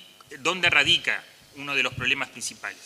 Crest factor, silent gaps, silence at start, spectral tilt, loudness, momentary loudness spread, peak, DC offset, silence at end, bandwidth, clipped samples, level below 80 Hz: 22 dB; none; 0 s; -1.5 dB/octave; -23 LUFS; 14 LU; -4 dBFS; under 0.1%; 0 s; 15.5 kHz; under 0.1%; -58 dBFS